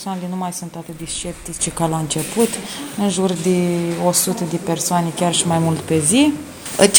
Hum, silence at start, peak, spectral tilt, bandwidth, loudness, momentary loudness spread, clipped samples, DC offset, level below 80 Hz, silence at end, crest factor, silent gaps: none; 0 s; 0 dBFS; -4 dB/octave; over 20 kHz; -19 LUFS; 11 LU; under 0.1%; under 0.1%; -48 dBFS; 0 s; 18 dB; none